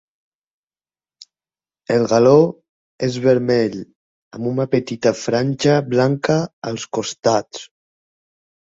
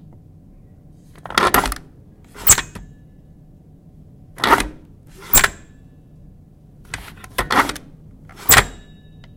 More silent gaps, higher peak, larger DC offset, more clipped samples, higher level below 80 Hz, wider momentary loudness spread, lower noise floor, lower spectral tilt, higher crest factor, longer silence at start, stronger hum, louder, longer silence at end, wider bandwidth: first, 2.69-2.99 s, 3.95-4.31 s, 6.53-6.62 s vs none; about the same, -2 dBFS vs 0 dBFS; neither; neither; second, -58 dBFS vs -36 dBFS; second, 13 LU vs 21 LU; first, under -90 dBFS vs -45 dBFS; first, -6 dB/octave vs -1.5 dB/octave; about the same, 18 dB vs 22 dB; first, 1.9 s vs 1.25 s; neither; about the same, -18 LUFS vs -16 LUFS; first, 1 s vs 0.65 s; second, 7.8 kHz vs 17 kHz